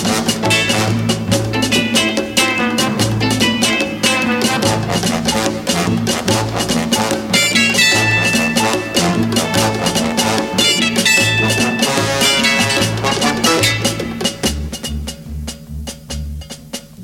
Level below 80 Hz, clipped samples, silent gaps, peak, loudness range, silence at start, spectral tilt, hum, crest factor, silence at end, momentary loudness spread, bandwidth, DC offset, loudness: -36 dBFS; under 0.1%; none; 0 dBFS; 4 LU; 0 s; -3 dB/octave; none; 16 dB; 0 s; 15 LU; 17.5 kHz; under 0.1%; -14 LUFS